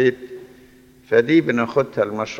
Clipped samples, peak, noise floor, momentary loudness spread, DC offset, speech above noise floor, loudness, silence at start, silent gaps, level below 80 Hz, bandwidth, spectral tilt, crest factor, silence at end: under 0.1%; -4 dBFS; -49 dBFS; 21 LU; under 0.1%; 30 dB; -19 LUFS; 0 s; none; -58 dBFS; 7.2 kHz; -6.5 dB/octave; 16 dB; 0 s